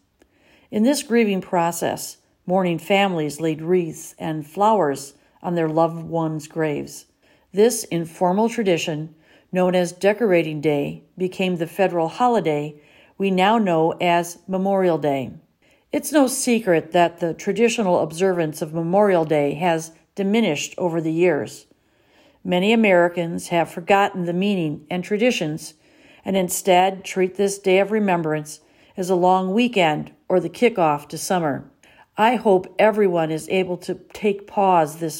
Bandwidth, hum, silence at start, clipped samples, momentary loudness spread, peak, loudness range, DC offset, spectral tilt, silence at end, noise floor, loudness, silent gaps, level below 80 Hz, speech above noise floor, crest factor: 16.5 kHz; none; 0.7 s; under 0.1%; 11 LU; -4 dBFS; 3 LU; under 0.1%; -5 dB/octave; 0 s; -59 dBFS; -20 LUFS; none; -66 dBFS; 39 dB; 16 dB